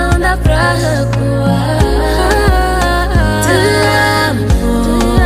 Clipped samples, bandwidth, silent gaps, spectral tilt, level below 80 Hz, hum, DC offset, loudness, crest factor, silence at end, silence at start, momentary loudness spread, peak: under 0.1%; 16 kHz; none; -5.5 dB/octave; -16 dBFS; none; under 0.1%; -12 LUFS; 10 dB; 0 s; 0 s; 3 LU; 0 dBFS